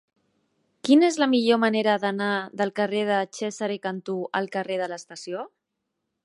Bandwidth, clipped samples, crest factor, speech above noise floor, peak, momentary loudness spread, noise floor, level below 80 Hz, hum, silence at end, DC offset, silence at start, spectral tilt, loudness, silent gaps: 11.5 kHz; under 0.1%; 20 dB; 57 dB; -6 dBFS; 15 LU; -80 dBFS; -80 dBFS; none; 0.75 s; under 0.1%; 0.85 s; -4.5 dB/octave; -24 LUFS; none